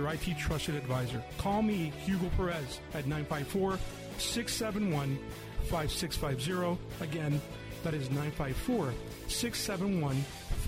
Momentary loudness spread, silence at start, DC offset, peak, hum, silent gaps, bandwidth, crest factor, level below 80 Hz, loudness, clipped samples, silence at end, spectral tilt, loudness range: 6 LU; 0 s; under 0.1%; -20 dBFS; none; none; 16 kHz; 14 dB; -44 dBFS; -34 LUFS; under 0.1%; 0 s; -5 dB/octave; 1 LU